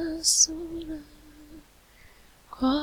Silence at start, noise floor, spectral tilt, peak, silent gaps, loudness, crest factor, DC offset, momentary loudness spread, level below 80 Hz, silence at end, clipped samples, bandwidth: 0 s; -55 dBFS; -1 dB/octave; -8 dBFS; none; -24 LUFS; 22 dB; under 0.1%; 20 LU; -52 dBFS; 0 s; under 0.1%; 19 kHz